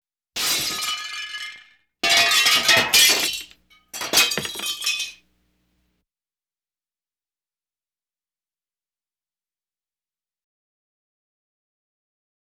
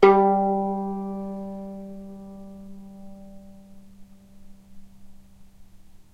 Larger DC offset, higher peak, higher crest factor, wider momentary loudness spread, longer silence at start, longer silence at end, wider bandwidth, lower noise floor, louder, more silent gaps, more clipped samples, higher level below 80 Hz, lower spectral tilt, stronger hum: neither; about the same, -4 dBFS vs -2 dBFS; about the same, 22 dB vs 24 dB; second, 18 LU vs 26 LU; first, 0.35 s vs 0 s; first, 7.3 s vs 0.1 s; first, over 20 kHz vs 6.6 kHz; first, under -90 dBFS vs -47 dBFS; first, -18 LUFS vs -25 LUFS; neither; neither; second, -60 dBFS vs -54 dBFS; second, 1 dB/octave vs -8 dB/octave; neither